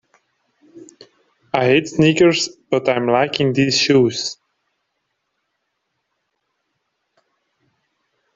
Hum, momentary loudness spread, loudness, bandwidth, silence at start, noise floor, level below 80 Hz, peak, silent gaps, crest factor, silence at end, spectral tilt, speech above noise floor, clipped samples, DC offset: none; 10 LU; -16 LUFS; 7.8 kHz; 0.75 s; -73 dBFS; -58 dBFS; -2 dBFS; none; 20 dB; 4.05 s; -4.5 dB/octave; 58 dB; under 0.1%; under 0.1%